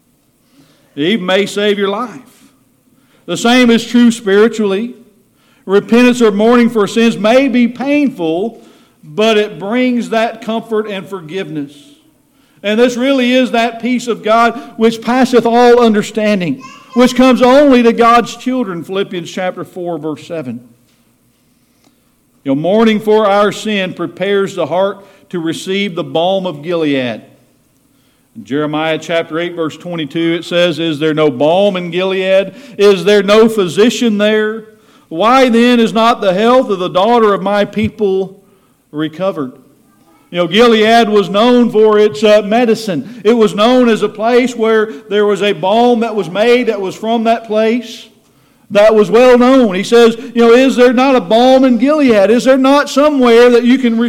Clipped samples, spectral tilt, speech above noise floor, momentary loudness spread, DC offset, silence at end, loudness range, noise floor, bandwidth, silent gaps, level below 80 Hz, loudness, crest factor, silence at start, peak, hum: under 0.1%; -5 dB/octave; 44 dB; 13 LU; under 0.1%; 0 s; 9 LU; -54 dBFS; 15 kHz; none; -50 dBFS; -11 LUFS; 10 dB; 0.95 s; 0 dBFS; none